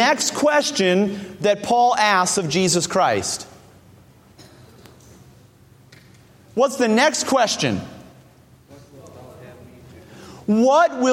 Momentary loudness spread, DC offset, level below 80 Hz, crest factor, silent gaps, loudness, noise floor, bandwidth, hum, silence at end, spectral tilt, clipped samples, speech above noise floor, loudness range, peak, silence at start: 11 LU; under 0.1%; -58 dBFS; 18 dB; none; -18 LUFS; -50 dBFS; 16.5 kHz; none; 0 s; -3.5 dB/octave; under 0.1%; 32 dB; 10 LU; -2 dBFS; 0 s